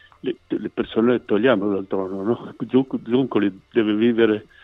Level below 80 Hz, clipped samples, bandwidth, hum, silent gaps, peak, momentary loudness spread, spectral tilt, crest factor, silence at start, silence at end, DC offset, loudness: -58 dBFS; under 0.1%; 4 kHz; none; none; -4 dBFS; 9 LU; -9 dB/octave; 18 dB; 0.25 s; 0.2 s; under 0.1%; -21 LUFS